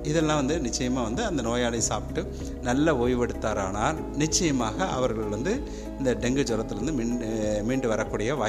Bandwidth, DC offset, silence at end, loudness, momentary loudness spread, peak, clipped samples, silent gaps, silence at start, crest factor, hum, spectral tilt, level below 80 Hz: 14.5 kHz; under 0.1%; 0 s; -27 LUFS; 6 LU; -10 dBFS; under 0.1%; none; 0 s; 16 dB; none; -4.5 dB/octave; -38 dBFS